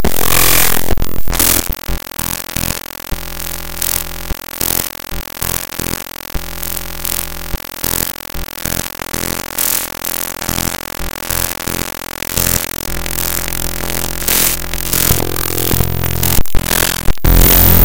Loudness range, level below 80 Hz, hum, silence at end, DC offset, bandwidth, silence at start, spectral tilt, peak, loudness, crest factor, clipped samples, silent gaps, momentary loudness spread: 6 LU; -22 dBFS; none; 0 s; under 0.1%; over 20 kHz; 0 s; -3 dB/octave; 0 dBFS; -15 LUFS; 14 dB; 0.4%; none; 12 LU